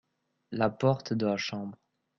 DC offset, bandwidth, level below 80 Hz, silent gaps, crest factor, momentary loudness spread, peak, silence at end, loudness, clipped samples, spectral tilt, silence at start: under 0.1%; 7.4 kHz; -66 dBFS; none; 20 dB; 13 LU; -12 dBFS; 0.45 s; -30 LUFS; under 0.1%; -6.5 dB/octave; 0.5 s